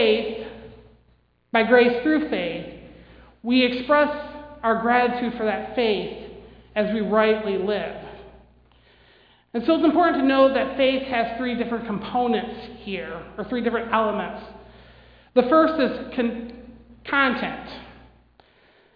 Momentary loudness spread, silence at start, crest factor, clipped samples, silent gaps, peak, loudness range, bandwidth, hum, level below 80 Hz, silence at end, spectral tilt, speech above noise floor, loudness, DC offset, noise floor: 19 LU; 0 s; 20 dB; under 0.1%; none; -4 dBFS; 5 LU; 5.2 kHz; none; -52 dBFS; 1 s; -8 dB/octave; 40 dB; -22 LUFS; under 0.1%; -61 dBFS